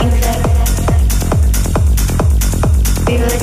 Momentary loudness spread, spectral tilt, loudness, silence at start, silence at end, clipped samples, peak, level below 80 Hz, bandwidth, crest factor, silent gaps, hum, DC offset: 1 LU; -5.5 dB/octave; -14 LUFS; 0 s; 0 s; under 0.1%; 0 dBFS; -14 dBFS; 16 kHz; 10 dB; none; none; under 0.1%